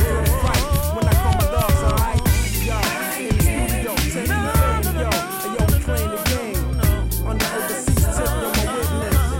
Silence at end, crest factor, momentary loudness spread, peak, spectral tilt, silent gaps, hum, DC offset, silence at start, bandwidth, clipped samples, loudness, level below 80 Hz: 0 s; 12 dB; 4 LU; -8 dBFS; -5 dB/octave; none; none; under 0.1%; 0 s; 17 kHz; under 0.1%; -20 LUFS; -22 dBFS